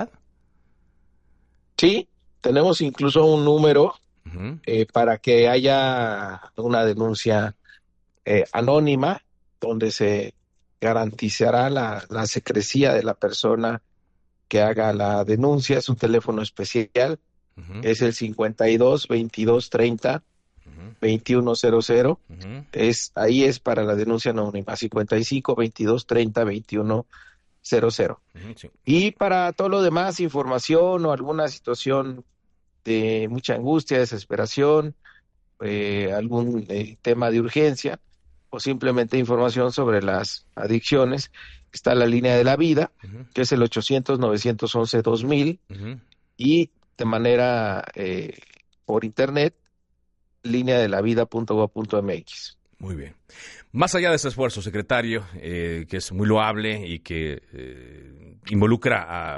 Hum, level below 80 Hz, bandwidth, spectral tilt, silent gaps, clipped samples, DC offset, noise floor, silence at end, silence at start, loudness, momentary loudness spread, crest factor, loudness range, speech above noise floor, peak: none; -56 dBFS; 11.5 kHz; -5.5 dB/octave; none; under 0.1%; under 0.1%; -68 dBFS; 0 s; 0 s; -22 LUFS; 14 LU; 18 dB; 4 LU; 46 dB; -4 dBFS